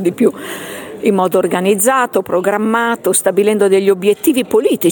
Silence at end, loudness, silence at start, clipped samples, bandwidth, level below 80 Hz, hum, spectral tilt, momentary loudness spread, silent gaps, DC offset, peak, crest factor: 0 s; -13 LUFS; 0 s; under 0.1%; 17.5 kHz; -60 dBFS; none; -4 dB/octave; 5 LU; none; under 0.1%; 0 dBFS; 12 dB